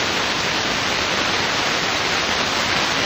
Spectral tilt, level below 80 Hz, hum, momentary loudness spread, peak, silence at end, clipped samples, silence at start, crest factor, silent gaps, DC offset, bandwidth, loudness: -2 dB/octave; -44 dBFS; none; 1 LU; -4 dBFS; 0 s; under 0.1%; 0 s; 16 dB; none; under 0.1%; 16 kHz; -19 LUFS